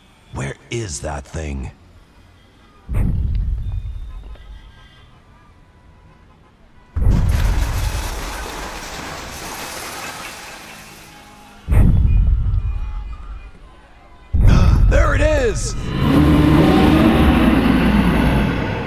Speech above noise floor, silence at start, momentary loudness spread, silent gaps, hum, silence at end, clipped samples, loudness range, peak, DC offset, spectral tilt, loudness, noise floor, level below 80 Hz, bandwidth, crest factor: 22 dB; 0.35 s; 22 LU; none; none; 0 s; under 0.1%; 15 LU; -2 dBFS; under 0.1%; -6.5 dB/octave; -18 LUFS; -48 dBFS; -22 dBFS; 15.5 kHz; 16 dB